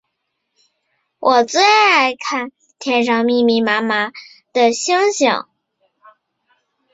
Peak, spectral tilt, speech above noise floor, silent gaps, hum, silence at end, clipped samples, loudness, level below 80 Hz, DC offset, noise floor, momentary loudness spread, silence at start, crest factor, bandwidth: -2 dBFS; -2.5 dB/octave; 59 dB; none; none; 1.5 s; under 0.1%; -15 LUFS; -66 dBFS; under 0.1%; -73 dBFS; 12 LU; 1.2 s; 16 dB; 7.8 kHz